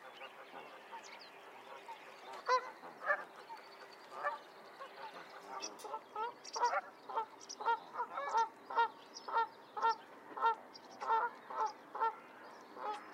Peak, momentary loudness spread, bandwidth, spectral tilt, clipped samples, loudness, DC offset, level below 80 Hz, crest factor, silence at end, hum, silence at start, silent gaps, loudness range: -20 dBFS; 16 LU; 16 kHz; -1 dB/octave; under 0.1%; -40 LUFS; under 0.1%; under -90 dBFS; 20 dB; 0 s; none; 0 s; none; 6 LU